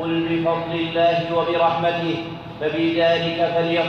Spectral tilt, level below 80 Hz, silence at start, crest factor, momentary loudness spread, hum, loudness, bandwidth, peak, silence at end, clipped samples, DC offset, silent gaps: -7 dB/octave; -54 dBFS; 0 s; 12 dB; 7 LU; none; -20 LUFS; 6.6 kHz; -8 dBFS; 0 s; under 0.1%; under 0.1%; none